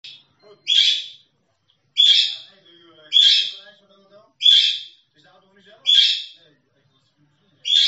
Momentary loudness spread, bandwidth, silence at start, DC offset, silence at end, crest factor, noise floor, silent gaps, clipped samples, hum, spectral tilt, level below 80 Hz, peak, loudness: 19 LU; 8.4 kHz; 0.05 s; under 0.1%; 0 s; 18 dB; -66 dBFS; none; under 0.1%; none; 3.5 dB/octave; -88 dBFS; -2 dBFS; -15 LUFS